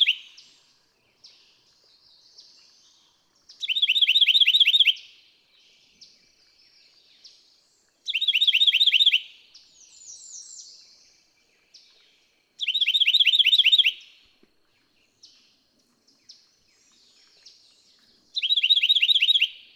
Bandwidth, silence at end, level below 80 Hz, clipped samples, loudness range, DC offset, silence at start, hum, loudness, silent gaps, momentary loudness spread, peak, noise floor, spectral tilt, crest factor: 18 kHz; 0.25 s; -84 dBFS; under 0.1%; 11 LU; under 0.1%; 0 s; none; -18 LUFS; none; 24 LU; -8 dBFS; -66 dBFS; 5 dB/octave; 18 dB